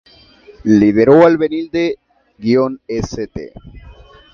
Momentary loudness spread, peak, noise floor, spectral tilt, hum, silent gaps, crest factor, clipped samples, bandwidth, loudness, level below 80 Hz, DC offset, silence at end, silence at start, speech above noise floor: 18 LU; 0 dBFS; -44 dBFS; -7.5 dB/octave; none; none; 16 dB; under 0.1%; 7 kHz; -14 LUFS; -42 dBFS; under 0.1%; 0.4 s; 0.65 s; 31 dB